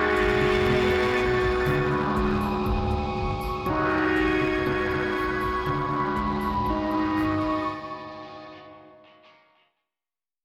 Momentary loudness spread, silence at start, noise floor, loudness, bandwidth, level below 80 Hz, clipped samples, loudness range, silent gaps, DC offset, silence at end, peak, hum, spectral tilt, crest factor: 11 LU; 0 s; under -90 dBFS; -25 LUFS; 15 kHz; -38 dBFS; under 0.1%; 6 LU; none; under 0.1%; 1.6 s; -12 dBFS; none; -7 dB/octave; 14 dB